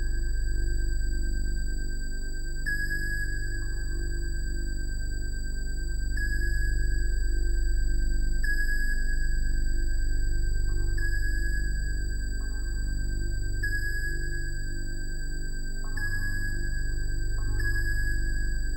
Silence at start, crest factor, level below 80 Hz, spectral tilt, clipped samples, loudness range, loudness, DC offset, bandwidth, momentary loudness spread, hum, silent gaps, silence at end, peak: 0 s; 10 dB; -26 dBFS; -4 dB/octave; under 0.1%; 3 LU; -33 LUFS; under 0.1%; 16 kHz; 6 LU; 50 Hz at -50 dBFS; none; 0 s; -16 dBFS